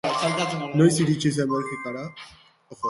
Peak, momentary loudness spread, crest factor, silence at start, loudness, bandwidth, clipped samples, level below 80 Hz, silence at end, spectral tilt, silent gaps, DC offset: -6 dBFS; 15 LU; 18 dB; 0.05 s; -23 LUFS; 11.5 kHz; under 0.1%; -62 dBFS; 0 s; -5.5 dB/octave; none; under 0.1%